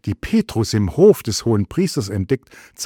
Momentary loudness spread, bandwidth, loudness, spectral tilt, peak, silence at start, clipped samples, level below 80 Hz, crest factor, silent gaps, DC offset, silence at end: 9 LU; 18 kHz; -18 LUFS; -6 dB/octave; -2 dBFS; 0.05 s; under 0.1%; -42 dBFS; 16 dB; none; under 0.1%; 0 s